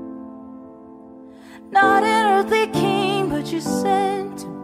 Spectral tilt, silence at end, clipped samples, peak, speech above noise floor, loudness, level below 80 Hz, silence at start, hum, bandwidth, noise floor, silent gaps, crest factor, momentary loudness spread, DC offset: -4.5 dB/octave; 0 s; under 0.1%; -4 dBFS; 23 dB; -19 LUFS; -54 dBFS; 0 s; none; 15.5 kHz; -42 dBFS; none; 16 dB; 22 LU; under 0.1%